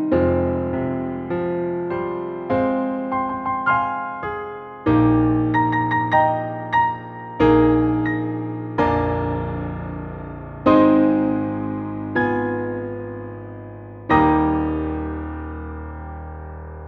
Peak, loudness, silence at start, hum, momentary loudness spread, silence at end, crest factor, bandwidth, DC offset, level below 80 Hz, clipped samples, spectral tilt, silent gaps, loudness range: -4 dBFS; -21 LUFS; 0 s; none; 17 LU; 0 s; 18 dB; 4.8 kHz; under 0.1%; -38 dBFS; under 0.1%; -9.5 dB/octave; none; 4 LU